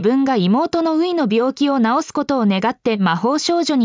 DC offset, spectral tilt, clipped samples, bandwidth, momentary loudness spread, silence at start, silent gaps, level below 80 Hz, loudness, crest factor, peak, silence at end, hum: under 0.1%; -5.5 dB/octave; under 0.1%; 7.6 kHz; 3 LU; 0 s; none; -60 dBFS; -17 LUFS; 12 dB; -4 dBFS; 0 s; none